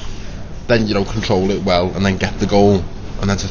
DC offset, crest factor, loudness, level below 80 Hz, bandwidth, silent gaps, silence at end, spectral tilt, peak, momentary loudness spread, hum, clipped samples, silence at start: under 0.1%; 16 dB; -17 LUFS; -30 dBFS; 7.2 kHz; none; 0 s; -6 dB/octave; 0 dBFS; 17 LU; none; under 0.1%; 0 s